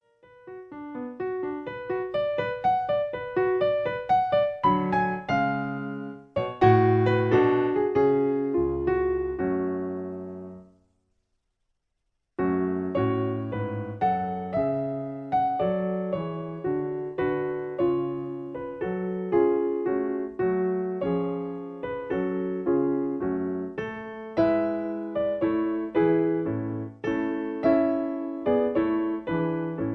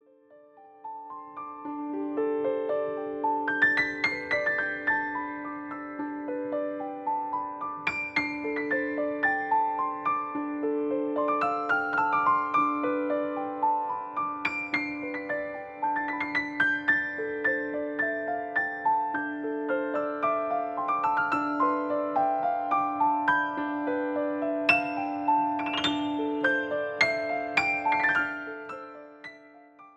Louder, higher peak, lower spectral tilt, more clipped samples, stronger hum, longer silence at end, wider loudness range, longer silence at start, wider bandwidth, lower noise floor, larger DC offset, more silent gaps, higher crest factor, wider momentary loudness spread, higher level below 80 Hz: about the same, -26 LUFS vs -28 LUFS; about the same, -6 dBFS vs -8 dBFS; first, -9.5 dB/octave vs -5 dB/octave; neither; neither; about the same, 0 s vs 0.05 s; about the same, 6 LU vs 4 LU; first, 0.45 s vs 0.3 s; second, 6.2 kHz vs 8.8 kHz; first, -78 dBFS vs -56 dBFS; neither; neither; about the same, 20 dB vs 20 dB; about the same, 11 LU vs 10 LU; first, -54 dBFS vs -68 dBFS